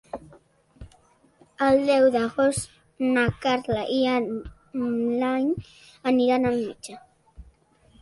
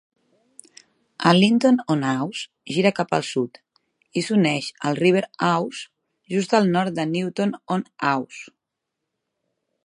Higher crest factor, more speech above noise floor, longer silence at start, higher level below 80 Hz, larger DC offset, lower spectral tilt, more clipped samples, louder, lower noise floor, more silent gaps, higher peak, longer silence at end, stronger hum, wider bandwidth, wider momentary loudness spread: second, 16 dB vs 22 dB; second, 36 dB vs 61 dB; second, 0.15 s vs 1.2 s; first, -52 dBFS vs -70 dBFS; neither; about the same, -5 dB/octave vs -5.5 dB/octave; neither; about the same, -24 LUFS vs -22 LUFS; second, -59 dBFS vs -82 dBFS; neither; second, -10 dBFS vs -2 dBFS; second, 0.6 s vs 1.4 s; neither; about the same, 11.5 kHz vs 11 kHz; first, 16 LU vs 12 LU